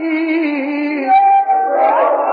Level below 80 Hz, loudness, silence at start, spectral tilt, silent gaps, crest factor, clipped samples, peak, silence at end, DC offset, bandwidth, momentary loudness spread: -66 dBFS; -14 LUFS; 0 s; -6.5 dB/octave; none; 10 dB; under 0.1%; -4 dBFS; 0 s; under 0.1%; 5 kHz; 8 LU